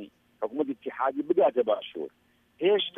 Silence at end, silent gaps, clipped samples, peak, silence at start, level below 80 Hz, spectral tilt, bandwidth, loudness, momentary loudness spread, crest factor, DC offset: 0.1 s; none; under 0.1%; -12 dBFS; 0 s; -78 dBFS; -7 dB/octave; 3.8 kHz; -28 LUFS; 15 LU; 16 dB; under 0.1%